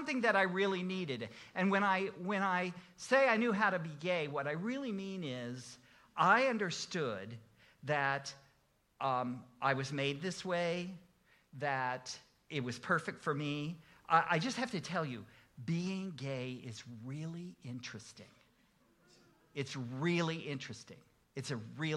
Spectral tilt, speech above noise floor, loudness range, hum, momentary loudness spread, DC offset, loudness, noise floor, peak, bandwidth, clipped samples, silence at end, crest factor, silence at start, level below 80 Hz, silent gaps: -5 dB/octave; 37 dB; 9 LU; none; 17 LU; under 0.1%; -36 LUFS; -73 dBFS; -14 dBFS; 12 kHz; under 0.1%; 0 s; 22 dB; 0 s; -78 dBFS; none